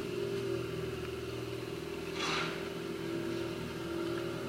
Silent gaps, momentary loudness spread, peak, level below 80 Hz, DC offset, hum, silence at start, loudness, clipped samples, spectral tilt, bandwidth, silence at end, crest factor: none; 6 LU; -22 dBFS; -58 dBFS; under 0.1%; none; 0 s; -38 LUFS; under 0.1%; -5 dB/octave; 16 kHz; 0 s; 16 dB